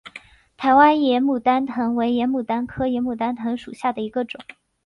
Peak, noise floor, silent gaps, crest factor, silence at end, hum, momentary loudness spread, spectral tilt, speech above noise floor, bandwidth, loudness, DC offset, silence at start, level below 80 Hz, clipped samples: -2 dBFS; -45 dBFS; none; 18 dB; 0.45 s; none; 13 LU; -6.5 dB/octave; 25 dB; 10.5 kHz; -21 LUFS; under 0.1%; 0.05 s; -54 dBFS; under 0.1%